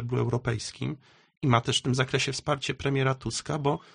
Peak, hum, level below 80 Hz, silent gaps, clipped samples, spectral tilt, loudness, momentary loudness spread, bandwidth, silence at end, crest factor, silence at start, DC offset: -8 dBFS; none; -54 dBFS; 1.37-1.41 s; under 0.1%; -5 dB/octave; -28 LUFS; 8 LU; 10 kHz; 0.15 s; 20 dB; 0 s; under 0.1%